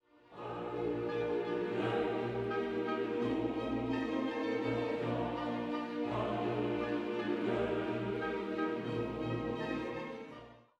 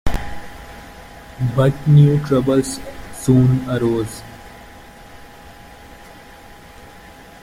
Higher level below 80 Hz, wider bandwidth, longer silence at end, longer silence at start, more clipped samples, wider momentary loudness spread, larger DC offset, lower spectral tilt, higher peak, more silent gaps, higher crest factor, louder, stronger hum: second, -62 dBFS vs -38 dBFS; second, 9.4 kHz vs 15 kHz; second, 0.2 s vs 0.45 s; first, 0.3 s vs 0.05 s; neither; second, 6 LU vs 26 LU; neither; about the same, -7.5 dB/octave vs -7.5 dB/octave; second, -22 dBFS vs -2 dBFS; neither; about the same, 14 dB vs 16 dB; second, -36 LUFS vs -17 LUFS; neither